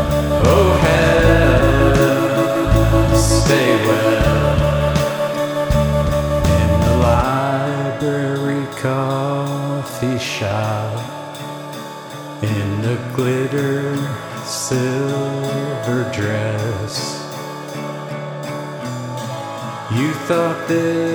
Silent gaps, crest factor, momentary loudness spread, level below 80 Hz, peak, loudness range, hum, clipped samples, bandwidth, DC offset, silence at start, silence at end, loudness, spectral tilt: none; 16 dB; 14 LU; -28 dBFS; 0 dBFS; 9 LU; none; under 0.1%; over 20 kHz; under 0.1%; 0 s; 0 s; -17 LUFS; -6 dB/octave